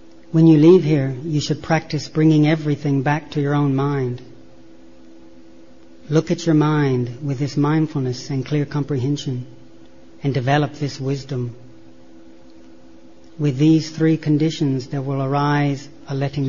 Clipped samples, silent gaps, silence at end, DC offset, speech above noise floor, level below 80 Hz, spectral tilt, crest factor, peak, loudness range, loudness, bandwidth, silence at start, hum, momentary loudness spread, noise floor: under 0.1%; none; 0 s; 0.8%; 28 dB; -54 dBFS; -7.5 dB/octave; 18 dB; -2 dBFS; 7 LU; -19 LUFS; 7.4 kHz; 0.35 s; none; 11 LU; -46 dBFS